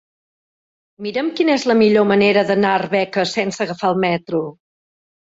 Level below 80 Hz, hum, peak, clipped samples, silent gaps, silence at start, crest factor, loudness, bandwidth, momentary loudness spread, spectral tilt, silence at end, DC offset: -60 dBFS; none; -2 dBFS; under 0.1%; none; 1 s; 16 dB; -17 LUFS; 8 kHz; 10 LU; -5.5 dB/octave; 0.8 s; under 0.1%